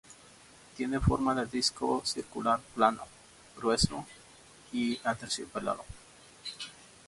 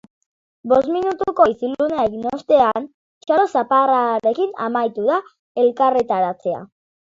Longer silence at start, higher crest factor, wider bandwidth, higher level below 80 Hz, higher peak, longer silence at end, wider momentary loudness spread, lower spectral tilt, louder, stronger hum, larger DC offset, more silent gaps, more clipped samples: second, 0.1 s vs 0.65 s; first, 24 dB vs 18 dB; first, 11.5 kHz vs 7.6 kHz; first, -48 dBFS vs -58 dBFS; second, -10 dBFS vs -2 dBFS; about the same, 0.25 s vs 0.35 s; first, 21 LU vs 11 LU; second, -4.5 dB/octave vs -6.5 dB/octave; second, -31 LUFS vs -18 LUFS; neither; neither; second, none vs 2.94-3.21 s, 5.39-5.55 s; neither